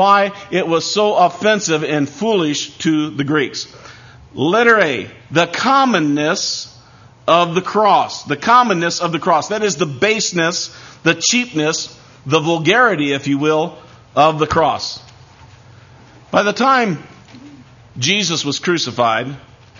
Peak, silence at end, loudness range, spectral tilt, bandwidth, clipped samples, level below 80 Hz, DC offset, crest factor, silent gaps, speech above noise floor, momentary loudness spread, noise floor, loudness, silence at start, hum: 0 dBFS; 0.4 s; 3 LU; -3.5 dB/octave; 7.4 kHz; under 0.1%; -52 dBFS; under 0.1%; 16 dB; none; 28 dB; 10 LU; -44 dBFS; -15 LUFS; 0 s; none